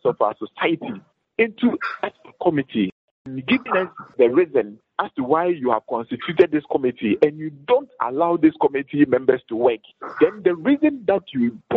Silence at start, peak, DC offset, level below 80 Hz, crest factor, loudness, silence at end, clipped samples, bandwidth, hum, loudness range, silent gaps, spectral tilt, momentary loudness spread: 0.05 s; -2 dBFS; under 0.1%; -64 dBFS; 18 dB; -21 LUFS; 0 s; under 0.1%; 5.4 kHz; none; 4 LU; 2.92-3.25 s; -4.5 dB/octave; 11 LU